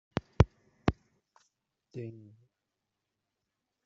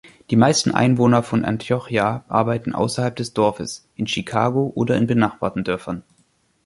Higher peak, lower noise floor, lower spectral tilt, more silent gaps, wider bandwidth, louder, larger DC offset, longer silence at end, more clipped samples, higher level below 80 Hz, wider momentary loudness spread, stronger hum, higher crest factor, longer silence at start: second, -8 dBFS vs -2 dBFS; first, -86 dBFS vs -62 dBFS; first, -7 dB/octave vs -5.5 dB/octave; neither; second, 7.4 kHz vs 11.5 kHz; second, -33 LUFS vs -20 LUFS; neither; first, 1.75 s vs 0.65 s; neither; first, -46 dBFS vs -52 dBFS; first, 22 LU vs 9 LU; neither; first, 28 dB vs 18 dB; first, 0.4 s vs 0.05 s